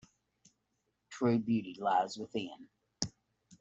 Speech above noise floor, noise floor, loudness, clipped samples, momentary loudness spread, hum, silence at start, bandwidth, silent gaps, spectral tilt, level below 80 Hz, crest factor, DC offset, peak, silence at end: 48 dB; -82 dBFS; -35 LUFS; under 0.1%; 14 LU; none; 1.1 s; 8 kHz; none; -5 dB/octave; -72 dBFS; 26 dB; under 0.1%; -12 dBFS; 0.05 s